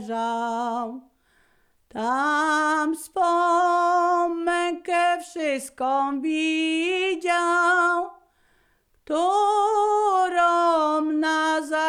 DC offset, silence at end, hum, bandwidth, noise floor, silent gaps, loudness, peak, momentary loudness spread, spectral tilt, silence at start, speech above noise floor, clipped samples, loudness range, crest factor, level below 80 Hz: under 0.1%; 0 s; none; 15 kHz; -64 dBFS; none; -22 LUFS; -10 dBFS; 7 LU; -2.5 dB/octave; 0 s; 42 dB; under 0.1%; 2 LU; 12 dB; -66 dBFS